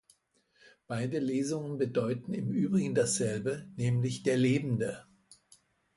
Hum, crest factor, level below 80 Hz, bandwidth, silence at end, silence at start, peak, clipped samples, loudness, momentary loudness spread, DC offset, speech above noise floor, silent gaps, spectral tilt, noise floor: none; 16 dB; -68 dBFS; 11.5 kHz; 0.95 s; 0.9 s; -16 dBFS; under 0.1%; -31 LUFS; 8 LU; under 0.1%; 41 dB; none; -6 dB/octave; -71 dBFS